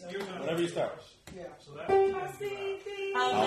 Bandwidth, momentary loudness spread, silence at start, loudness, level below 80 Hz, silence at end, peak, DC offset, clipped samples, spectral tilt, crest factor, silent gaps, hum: 14 kHz; 19 LU; 0 s; -32 LUFS; -66 dBFS; 0 s; -16 dBFS; under 0.1%; under 0.1%; -5 dB/octave; 16 dB; none; none